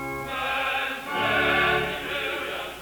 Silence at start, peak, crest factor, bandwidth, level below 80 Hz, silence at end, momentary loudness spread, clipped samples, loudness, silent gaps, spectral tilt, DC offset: 0 s; -10 dBFS; 16 dB; over 20 kHz; -50 dBFS; 0 s; 9 LU; under 0.1%; -25 LUFS; none; -3.5 dB/octave; under 0.1%